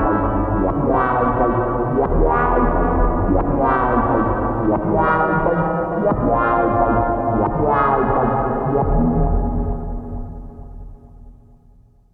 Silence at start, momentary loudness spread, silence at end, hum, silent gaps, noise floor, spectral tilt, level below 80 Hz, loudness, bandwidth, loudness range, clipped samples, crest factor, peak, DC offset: 0 s; 7 LU; 0.8 s; none; none; -49 dBFS; -11.5 dB/octave; -26 dBFS; -18 LUFS; 4 kHz; 4 LU; under 0.1%; 14 dB; -4 dBFS; under 0.1%